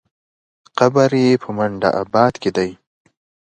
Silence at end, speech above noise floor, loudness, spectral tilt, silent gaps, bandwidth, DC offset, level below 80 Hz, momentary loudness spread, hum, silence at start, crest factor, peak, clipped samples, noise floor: 0.8 s; over 74 dB; -17 LUFS; -6.5 dB/octave; none; 9.2 kHz; under 0.1%; -54 dBFS; 8 LU; none; 0.75 s; 18 dB; 0 dBFS; under 0.1%; under -90 dBFS